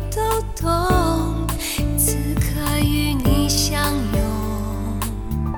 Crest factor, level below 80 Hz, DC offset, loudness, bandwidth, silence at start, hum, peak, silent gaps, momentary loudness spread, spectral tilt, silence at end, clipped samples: 16 dB; -26 dBFS; under 0.1%; -21 LUFS; 17.5 kHz; 0 s; none; -4 dBFS; none; 7 LU; -4.5 dB/octave; 0 s; under 0.1%